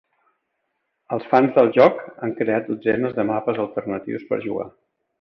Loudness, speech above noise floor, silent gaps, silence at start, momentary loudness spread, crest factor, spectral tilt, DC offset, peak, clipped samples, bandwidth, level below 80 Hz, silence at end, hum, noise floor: -21 LUFS; 55 dB; none; 1.1 s; 14 LU; 20 dB; -8.5 dB/octave; under 0.1%; -2 dBFS; under 0.1%; 6 kHz; -62 dBFS; 0.55 s; none; -75 dBFS